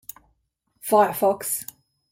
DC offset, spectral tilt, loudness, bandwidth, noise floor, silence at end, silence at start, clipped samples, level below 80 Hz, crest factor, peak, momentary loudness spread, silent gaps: under 0.1%; -3.5 dB/octave; -22 LUFS; 16.5 kHz; -71 dBFS; 0.5 s; 0.85 s; under 0.1%; -66 dBFS; 20 dB; -6 dBFS; 20 LU; none